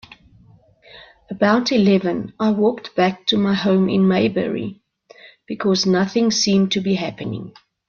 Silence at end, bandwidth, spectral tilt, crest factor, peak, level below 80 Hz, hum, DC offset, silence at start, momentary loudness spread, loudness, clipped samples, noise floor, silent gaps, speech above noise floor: 0.4 s; 7 kHz; -5 dB/octave; 16 dB; -2 dBFS; -58 dBFS; none; under 0.1%; 0.95 s; 13 LU; -18 LUFS; under 0.1%; -51 dBFS; none; 33 dB